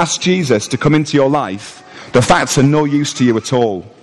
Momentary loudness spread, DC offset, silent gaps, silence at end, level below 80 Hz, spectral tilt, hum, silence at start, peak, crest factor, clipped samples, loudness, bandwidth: 9 LU; under 0.1%; none; 0.15 s; -42 dBFS; -5 dB/octave; none; 0 s; -2 dBFS; 12 dB; under 0.1%; -14 LUFS; 13 kHz